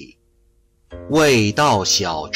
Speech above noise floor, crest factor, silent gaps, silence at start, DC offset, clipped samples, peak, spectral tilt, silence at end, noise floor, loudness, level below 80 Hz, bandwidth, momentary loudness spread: 42 dB; 14 dB; none; 0 s; under 0.1%; under 0.1%; -6 dBFS; -3.5 dB/octave; 0 s; -58 dBFS; -16 LUFS; -48 dBFS; 16 kHz; 3 LU